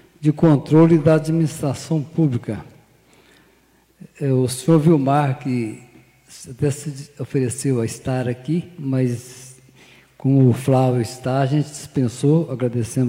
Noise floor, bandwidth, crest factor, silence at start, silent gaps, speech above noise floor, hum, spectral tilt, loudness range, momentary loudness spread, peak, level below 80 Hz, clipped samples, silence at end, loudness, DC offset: -57 dBFS; 15.5 kHz; 16 dB; 0.2 s; none; 38 dB; none; -7.5 dB/octave; 5 LU; 15 LU; -4 dBFS; -56 dBFS; under 0.1%; 0 s; -19 LUFS; under 0.1%